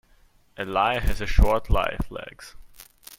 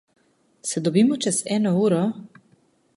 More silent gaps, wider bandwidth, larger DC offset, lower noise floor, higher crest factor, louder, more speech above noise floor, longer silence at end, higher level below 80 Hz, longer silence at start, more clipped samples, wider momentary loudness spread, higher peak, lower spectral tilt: neither; first, 16.5 kHz vs 11.5 kHz; neither; about the same, -58 dBFS vs -61 dBFS; about the same, 22 dB vs 18 dB; second, -25 LUFS vs -22 LUFS; second, 36 dB vs 40 dB; second, 0.05 s vs 0.75 s; first, -28 dBFS vs -68 dBFS; about the same, 0.6 s vs 0.65 s; neither; first, 22 LU vs 10 LU; first, -2 dBFS vs -6 dBFS; about the same, -5.5 dB/octave vs -5 dB/octave